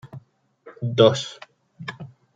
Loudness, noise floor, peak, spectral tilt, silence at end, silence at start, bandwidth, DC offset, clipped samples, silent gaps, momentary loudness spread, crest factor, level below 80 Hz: -20 LUFS; -53 dBFS; -2 dBFS; -5.5 dB/octave; 0.3 s; 0.05 s; 9 kHz; under 0.1%; under 0.1%; none; 26 LU; 22 dB; -68 dBFS